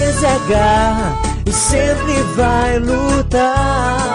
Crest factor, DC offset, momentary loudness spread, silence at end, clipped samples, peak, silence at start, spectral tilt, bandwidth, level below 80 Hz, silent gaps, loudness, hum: 12 dB; under 0.1%; 4 LU; 0 s; under 0.1%; -2 dBFS; 0 s; -4.5 dB/octave; 14 kHz; -22 dBFS; none; -14 LUFS; none